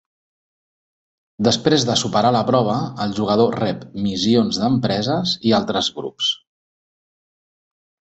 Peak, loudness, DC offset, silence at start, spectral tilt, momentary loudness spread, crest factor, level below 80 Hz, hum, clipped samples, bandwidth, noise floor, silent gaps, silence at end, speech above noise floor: -2 dBFS; -19 LUFS; under 0.1%; 1.4 s; -5 dB/octave; 7 LU; 20 dB; -54 dBFS; none; under 0.1%; 8.2 kHz; under -90 dBFS; none; 1.85 s; over 72 dB